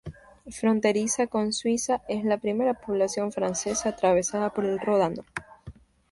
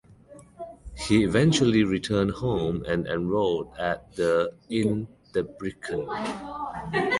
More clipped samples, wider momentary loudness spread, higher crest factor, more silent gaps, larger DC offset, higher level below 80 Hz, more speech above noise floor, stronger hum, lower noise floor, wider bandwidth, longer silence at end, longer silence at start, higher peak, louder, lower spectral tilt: neither; second, 5 LU vs 13 LU; about the same, 18 dB vs 18 dB; neither; neither; second, -56 dBFS vs -48 dBFS; about the same, 22 dB vs 25 dB; neither; about the same, -48 dBFS vs -50 dBFS; about the same, 11.5 kHz vs 11.5 kHz; first, 0.4 s vs 0 s; second, 0.05 s vs 0.3 s; about the same, -8 dBFS vs -8 dBFS; about the same, -26 LUFS vs -26 LUFS; second, -4 dB/octave vs -6 dB/octave